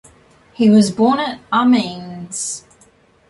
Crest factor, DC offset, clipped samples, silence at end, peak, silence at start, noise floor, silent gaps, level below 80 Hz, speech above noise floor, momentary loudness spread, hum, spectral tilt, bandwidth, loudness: 16 dB; under 0.1%; under 0.1%; 0.7 s; -2 dBFS; 0.6 s; -52 dBFS; none; -56 dBFS; 37 dB; 15 LU; none; -5 dB/octave; 11.5 kHz; -16 LUFS